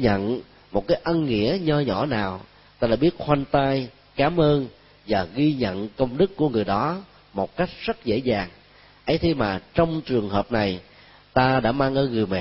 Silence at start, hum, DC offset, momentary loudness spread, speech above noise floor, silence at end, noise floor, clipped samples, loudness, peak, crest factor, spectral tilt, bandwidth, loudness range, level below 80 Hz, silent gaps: 0 s; none; under 0.1%; 9 LU; 26 dB; 0 s; -48 dBFS; under 0.1%; -23 LUFS; -4 dBFS; 20 dB; -11 dB/octave; 5.8 kHz; 2 LU; -44 dBFS; none